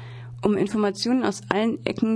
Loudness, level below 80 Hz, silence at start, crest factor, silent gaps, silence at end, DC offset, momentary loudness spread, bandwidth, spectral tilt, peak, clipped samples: -24 LUFS; -56 dBFS; 0 s; 22 dB; none; 0 s; under 0.1%; 4 LU; 10.5 kHz; -5.5 dB/octave; -2 dBFS; under 0.1%